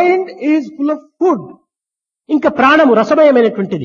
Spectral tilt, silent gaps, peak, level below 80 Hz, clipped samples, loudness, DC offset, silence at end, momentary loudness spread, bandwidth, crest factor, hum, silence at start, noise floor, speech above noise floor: -6.5 dB/octave; none; 0 dBFS; -56 dBFS; under 0.1%; -12 LUFS; under 0.1%; 0 s; 10 LU; 7.2 kHz; 12 dB; none; 0 s; -86 dBFS; 74 dB